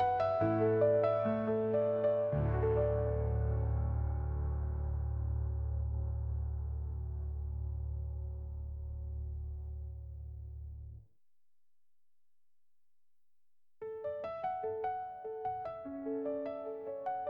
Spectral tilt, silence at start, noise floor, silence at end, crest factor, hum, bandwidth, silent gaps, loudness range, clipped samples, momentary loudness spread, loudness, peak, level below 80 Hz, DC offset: -11 dB/octave; 0 s; under -90 dBFS; 0 s; 18 dB; none; 4.9 kHz; none; 18 LU; under 0.1%; 13 LU; -36 LUFS; -18 dBFS; -42 dBFS; under 0.1%